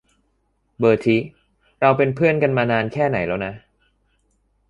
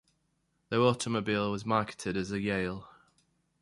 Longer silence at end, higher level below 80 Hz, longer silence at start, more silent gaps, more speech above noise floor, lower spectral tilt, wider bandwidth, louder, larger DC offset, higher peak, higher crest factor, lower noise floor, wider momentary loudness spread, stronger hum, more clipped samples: first, 1.1 s vs 0.7 s; first, -52 dBFS vs -60 dBFS; about the same, 0.8 s vs 0.7 s; neither; about the same, 49 dB vs 46 dB; first, -8 dB/octave vs -5.5 dB/octave; about the same, 10.5 kHz vs 11.5 kHz; first, -19 LUFS vs -31 LUFS; neither; first, -2 dBFS vs -10 dBFS; about the same, 18 dB vs 22 dB; second, -67 dBFS vs -76 dBFS; about the same, 8 LU vs 7 LU; neither; neither